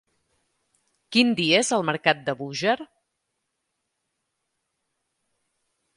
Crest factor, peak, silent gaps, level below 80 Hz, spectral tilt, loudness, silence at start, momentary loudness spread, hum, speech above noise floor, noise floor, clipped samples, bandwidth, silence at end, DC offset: 26 dB; -2 dBFS; none; -72 dBFS; -3.5 dB/octave; -22 LUFS; 1.1 s; 8 LU; none; 56 dB; -79 dBFS; under 0.1%; 11.5 kHz; 3.15 s; under 0.1%